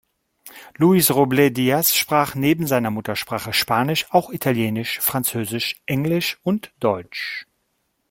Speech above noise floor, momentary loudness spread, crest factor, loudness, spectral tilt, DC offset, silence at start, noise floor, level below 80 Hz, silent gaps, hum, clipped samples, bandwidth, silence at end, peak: 51 dB; 9 LU; 18 dB; -20 LUFS; -4.5 dB/octave; under 0.1%; 0.45 s; -71 dBFS; -58 dBFS; none; none; under 0.1%; 17 kHz; 0.65 s; -2 dBFS